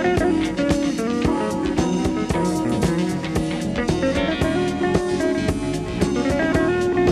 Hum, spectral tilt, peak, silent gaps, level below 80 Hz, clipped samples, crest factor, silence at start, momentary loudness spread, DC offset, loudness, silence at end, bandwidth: none; -6 dB/octave; -6 dBFS; none; -36 dBFS; under 0.1%; 16 dB; 0 s; 4 LU; under 0.1%; -21 LUFS; 0 s; 13.5 kHz